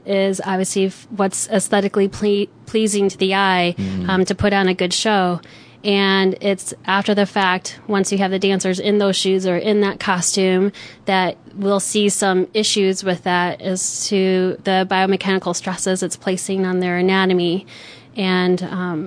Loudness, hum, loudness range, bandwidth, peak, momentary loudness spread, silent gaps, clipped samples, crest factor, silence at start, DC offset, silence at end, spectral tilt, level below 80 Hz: -18 LUFS; none; 1 LU; 11 kHz; -2 dBFS; 6 LU; none; under 0.1%; 16 dB; 0.05 s; under 0.1%; 0 s; -4 dB/octave; -52 dBFS